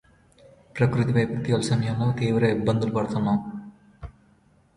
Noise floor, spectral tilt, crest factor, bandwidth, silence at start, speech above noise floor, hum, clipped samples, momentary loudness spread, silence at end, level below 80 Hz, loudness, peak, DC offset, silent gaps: -60 dBFS; -7 dB/octave; 18 dB; 11.5 kHz; 0.75 s; 37 dB; none; under 0.1%; 20 LU; 0.65 s; -52 dBFS; -24 LUFS; -8 dBFS; under 0.1%; none